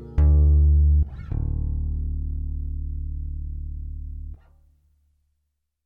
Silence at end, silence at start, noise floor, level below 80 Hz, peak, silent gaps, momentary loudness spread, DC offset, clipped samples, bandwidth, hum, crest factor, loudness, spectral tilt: 1.5 s; 0 s; -77 dBFS; -24 dBFS; -10 dBFS; none; 18 LU; under 0.1%; under 0.1%; 1.7 kHz; none; 12 dB; -24 LUFS; -12 dB/octave